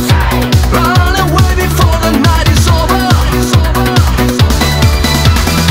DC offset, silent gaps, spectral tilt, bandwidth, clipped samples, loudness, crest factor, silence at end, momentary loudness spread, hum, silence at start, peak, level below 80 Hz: under 0.1%; none; -5 dB/octave; 16.5 kHz; 1%; -9 LUFS; 8 dB; 0 s; 1 LU; none; 0 s; 0 dBFS; -14 dBFS